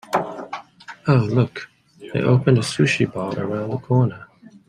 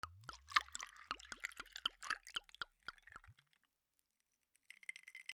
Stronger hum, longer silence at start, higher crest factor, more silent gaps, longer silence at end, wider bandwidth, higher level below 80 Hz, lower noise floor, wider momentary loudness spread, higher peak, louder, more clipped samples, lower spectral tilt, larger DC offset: neither; about the same, 0.1 s vs 0.05 s; second, 18 dB vs 34 dB; neither; first, 0.45 s vs 0 s; second, 11 kHz vs 19.5 kHz; first, -58 dBFS vs -74 dBFS; second, -39 dBFS vs -87 dBFS; about the same, 17 LU vs 19 LU; first, -2 dBFS vs -16 dBFS; first, -20 LUFS vs -45 LUFS; neither; first, -6.5 dB/octave vs 0.5 dB/octave; neither